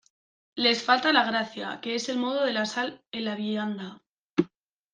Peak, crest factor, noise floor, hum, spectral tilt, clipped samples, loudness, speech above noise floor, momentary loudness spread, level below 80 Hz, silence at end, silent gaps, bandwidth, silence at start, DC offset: -4 dBFS; 24 dB; -56 dBFS; none; -3.5 dB/octave; under 0.1%; -27 LUFS; 29 dB; 13 LU; -74 dBFS; 0.45 s; 4.07-4.30 s; 9.8 kHz; 0.55 s; under 0.1%